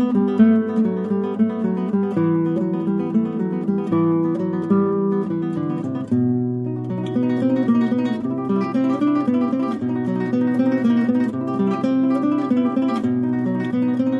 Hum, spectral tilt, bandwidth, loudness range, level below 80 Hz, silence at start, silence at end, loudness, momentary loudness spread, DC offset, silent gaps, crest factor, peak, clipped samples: none; -9.5 dB/octave; 5.8 kHz; 2 LU; -64 dBFS; 0 s; 0 s; -20 LUFS; 5 LU; under 0.1%; none; 16 dB; -4 dBFS; under 0.1%